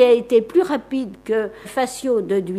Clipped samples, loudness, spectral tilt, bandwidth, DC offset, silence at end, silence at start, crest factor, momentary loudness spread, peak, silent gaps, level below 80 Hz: under 0.1%; -20 LUFS; -5 dB/octave; 14.5 kHz; under 0.1%; 0 s; 0 s; 16 dB; 9 LU; -2 dBFS; none; -56 dBFS